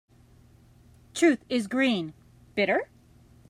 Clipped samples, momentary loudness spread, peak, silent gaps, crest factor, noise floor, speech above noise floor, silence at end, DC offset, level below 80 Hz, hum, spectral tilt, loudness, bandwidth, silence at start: under 0.1%; 15 LU; -10 dBFS; none; 18 dB; -56 dBFS; 31 dB; 0.65 s; under 0.1%; -64 dBFS; none; -4.5 dB/octave; -26 LUFS; 15.5 kHz; 1.15 s